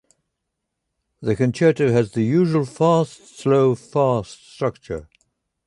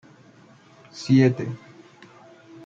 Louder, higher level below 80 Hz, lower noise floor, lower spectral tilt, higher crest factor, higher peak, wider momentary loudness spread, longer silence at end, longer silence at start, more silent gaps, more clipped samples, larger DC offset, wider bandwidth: about the same, -20 LUFS vs -21 LUFS; first, -52 dBFS vs -68 dBFS; first, -79 dBFS vs -52 dBFS; about the same, -7.5 dB/octave vs -7.5 dB/octave; about the same, 16 dB vs 18 dB; about the same, -4 dBFS vs -6 dBFS; second, 12 LU vs 22 LU; second, 0.65 s vs 1.1 s; first, 1.2 s vs 0.95 s; neither; neither; neither; first, 11.5 kHz vs 7.6 kHz